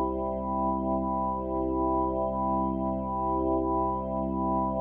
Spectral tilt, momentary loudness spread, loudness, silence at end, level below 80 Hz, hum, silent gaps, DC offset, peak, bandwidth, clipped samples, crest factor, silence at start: -12.5 dB/octave; 3 LU; -29 LUFS; 0 s; -42 dBFS; none; none; under 0.1%; -18 dBFS; 3.3 kHz; under 0.1%; 10 dB; 0 s